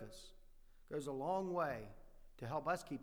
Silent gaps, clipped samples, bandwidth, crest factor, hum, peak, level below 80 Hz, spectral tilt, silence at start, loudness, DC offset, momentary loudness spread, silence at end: none; under 0.1%; over 20 kHz; 18 dB; none; -26 dBFS; -62 dBFS; -6 dB/octave; 0 s; -43 LUFS; under 0.1%; 18 LU; 0 s